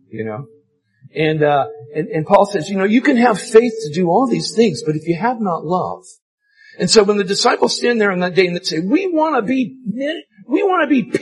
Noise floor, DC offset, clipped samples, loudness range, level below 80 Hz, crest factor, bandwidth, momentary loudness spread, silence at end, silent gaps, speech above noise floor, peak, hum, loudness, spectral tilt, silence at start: -49 dBFS; under 0.1%; under 0.1%; 2 LU; -58 dBFS; 16 dB; 12 kHz; 11 LU; 0 s; 6.22-6.38 s; 33 dB; 0 dBFS; none; -16 LUFS; -5 dB/octave; 0.15 s